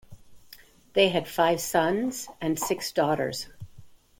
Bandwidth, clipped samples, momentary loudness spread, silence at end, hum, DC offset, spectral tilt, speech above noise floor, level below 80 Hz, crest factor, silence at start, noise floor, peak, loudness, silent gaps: 17 kHz; under 0.1%; 9 LU; 0.3 s; none; under 0.1%; -4 dB/octave; 27 dB; -60 dBFS; 20 dB; 0.1 s; -52 dBFS; -8 dBFS; -26 LUFS; none